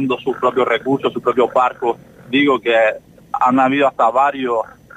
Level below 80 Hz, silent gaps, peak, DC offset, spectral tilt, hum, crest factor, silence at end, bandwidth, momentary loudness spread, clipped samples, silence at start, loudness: -58 dBFS; none; -4 dBFS; under 0.1%; -6 dB/octave; none; 14 dB; 0.3 s; 9.4 kHz; 8 LU; under 0.1%; 0 s; -16 LUFS